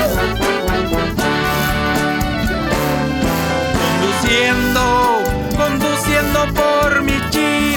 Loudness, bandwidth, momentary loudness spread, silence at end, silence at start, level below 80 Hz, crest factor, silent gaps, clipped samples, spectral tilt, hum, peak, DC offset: -16 LUFS; over 20 kHz; 4 LU; 0 s; 0 s; -28 dBFS; 14 dB; none; under 0.1%; -4.5 dB/octave; none; -2 dBFS; under 0.1%